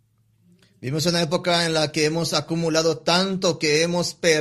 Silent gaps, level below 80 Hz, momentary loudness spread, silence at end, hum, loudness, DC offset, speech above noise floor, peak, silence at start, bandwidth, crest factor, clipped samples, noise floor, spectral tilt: none; -58 dBFS; 3 LU; 0 s; none; -21 LUFS; under 0.1%; 40 dB; -4 dBFS; 0.8 s; 14 kHz; 18 dB; under 0.1%; -61 dBFS; -4 dB/octave